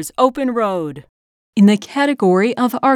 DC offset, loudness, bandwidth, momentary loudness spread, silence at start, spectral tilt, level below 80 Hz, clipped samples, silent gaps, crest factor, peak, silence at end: under 0.1%; -16 LUFS; 16 kHz; 10 LU; 0 s; -6 dB/octave; -58 dBFS; under 0.1%; 1.09-1.53 s; 16 dB; 0 dBFS; 0 s